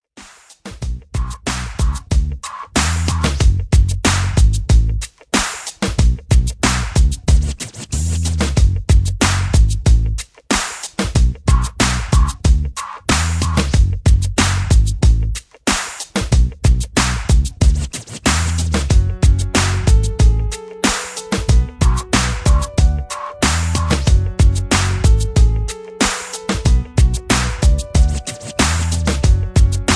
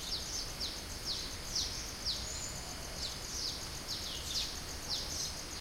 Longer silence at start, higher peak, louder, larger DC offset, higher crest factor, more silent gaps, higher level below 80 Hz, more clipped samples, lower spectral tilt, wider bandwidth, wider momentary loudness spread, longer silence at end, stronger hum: first, 0.15 s vs 0 s; first, 0 dBFS vs -24 dBFS; first, -17 LUFS vs -38 LUFS; neither; about the same, 14 dB vs 16 dB; neither; first, -16 dBFS vs -50 dBFS; neither; first, -4.5 dB/octave vs -1.5 dB/octave; second, 11 kHz vs 16 kHz; first, 8 LU vs 4 LU; about the same, 0 s vs 0 s; neither